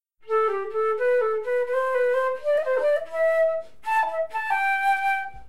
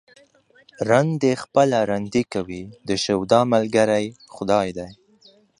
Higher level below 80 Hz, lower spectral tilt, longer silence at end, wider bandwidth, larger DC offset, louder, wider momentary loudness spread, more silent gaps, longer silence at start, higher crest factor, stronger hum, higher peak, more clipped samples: second, -62 dBFS vs -56 dBFS; second, -3 dB/octave vs -5.5 dB/octave; second, 0.05 s vs 0.65 s; first, 15 kHz vs 11 kHz; first, 0.9% vs under 0.1%; second, -24 LUFS vs -21 LUFS; second, 4 LU vs 14 LU; neither; second, 0 s vs 0.8 s; second, 12 dB vs 20 dB; neither; second, -12 dBFS vs -2 dBFS; neither